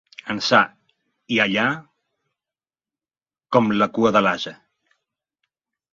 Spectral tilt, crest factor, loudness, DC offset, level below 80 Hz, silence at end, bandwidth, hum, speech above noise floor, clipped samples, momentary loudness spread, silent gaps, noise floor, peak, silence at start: -5 dB/octave; 22 dB; -20 LUFS; under 0.1%; -62 dBFS; 1.4 s; 7.6 kHz; none; over 71 dB; under 0.1%; 11 LU; none; under -90 dBFS; 0 dBFS; 0.25 s